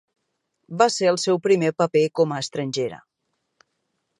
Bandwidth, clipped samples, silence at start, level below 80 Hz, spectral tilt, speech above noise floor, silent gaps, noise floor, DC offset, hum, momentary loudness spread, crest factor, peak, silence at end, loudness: 11 kHz; under 0.1%; 0.7 s; -72 dBFS; -4.5 dB/octave; 55 dB; none; -76 dBFS; under 0.1%; none; 9 LU; 22 dB; -2 dBFS; 1.2 s; -21 LUFS